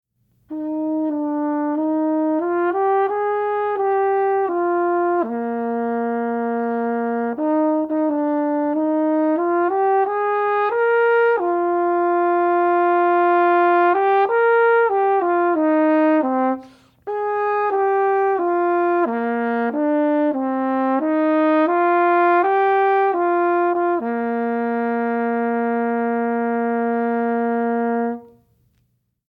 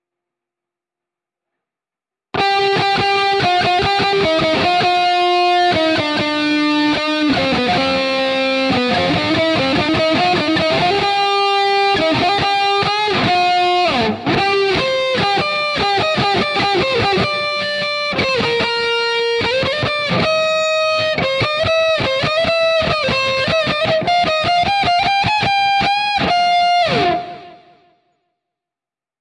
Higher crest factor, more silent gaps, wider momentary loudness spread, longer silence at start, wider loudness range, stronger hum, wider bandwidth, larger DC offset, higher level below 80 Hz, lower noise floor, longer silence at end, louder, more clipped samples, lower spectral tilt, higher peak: about the same, 14 dB vs 12 dB; neither; first, 6 LU vs 3 LU; second, 0.5 s vs 2.35 s; first, 5 LU vs 2 LU; neither; second, 4.8 kHz vs 11 kHz; neither; second, -68 dBFS vs -46 dBFS; second, -67 dBFS vs -90 dBFS; second, 1.05 s vs 1.65 s; second, -19 LUFS vs -15 LUFS; neither; first, -8 dB/octave vs -4.5 dB/octave; about the same, -4 dBFS vs -4 dBFS